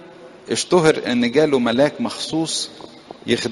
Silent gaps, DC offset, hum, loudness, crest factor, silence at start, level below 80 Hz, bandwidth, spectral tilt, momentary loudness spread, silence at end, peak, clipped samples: none; under 0.1%; none; -19 LUFS; 18 dB; 0 s; -56 dBFS; 11.5 kHz; -4 dB/octave; 14 LU; 0 s; 0 dBFS; under 0.1%